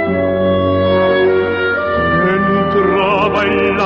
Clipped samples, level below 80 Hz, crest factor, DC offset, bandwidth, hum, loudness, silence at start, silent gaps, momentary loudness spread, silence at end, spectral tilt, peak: under 0.1%; -38 dBFS; 10 dB; under 0.1%; 6.8 kHz; none; -13 LUFS; 0 s; none; 3 LU; 0 s; -8 dB/octave; -4 dBFS